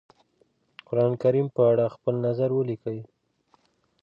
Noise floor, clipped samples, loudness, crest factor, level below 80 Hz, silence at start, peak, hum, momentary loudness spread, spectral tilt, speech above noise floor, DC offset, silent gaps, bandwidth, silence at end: -67 dBFS; under 0.1%; -25 LUFS; 16 dB; -70 dBFS; 0.9 s; -10 dBFS; none; 11 LU; -10.5 dB/octave; 43 dB; under 0.1%; none; 5.4 kHz; 0.95 s